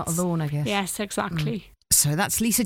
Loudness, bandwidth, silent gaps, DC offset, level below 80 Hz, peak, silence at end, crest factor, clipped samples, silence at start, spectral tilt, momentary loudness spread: -23 LUFS; 17.5 kHz; none; under 0.1%; -48 dBFS; -6 dBFS; 0 s; 18 dB; under 0.1%; 0 s; -3.5 dB/octave; 9 LU